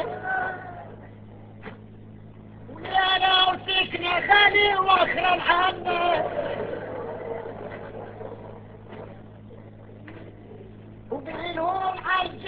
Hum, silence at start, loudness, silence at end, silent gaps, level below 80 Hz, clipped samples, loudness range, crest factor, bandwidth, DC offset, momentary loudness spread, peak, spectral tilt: none; 0 s; -22 LUFS; 0 s; none; -52 dBFS; under 0.1%; 21 LU; 22 dB; 6 kHz; under 0.1%; 25 LU; -4 dBFS; -6 dB/octave